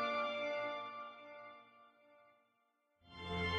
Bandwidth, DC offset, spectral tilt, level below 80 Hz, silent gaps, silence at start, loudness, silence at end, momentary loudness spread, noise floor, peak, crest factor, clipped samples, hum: 10 kHz; under 0.1%; -5.5 dB/octave; -66 dBFS; none; 0 s; -42 LUFS; 0 s; 20 LU; -80 dBFS; -26 dBFS; 18 dB; under 0.1%; none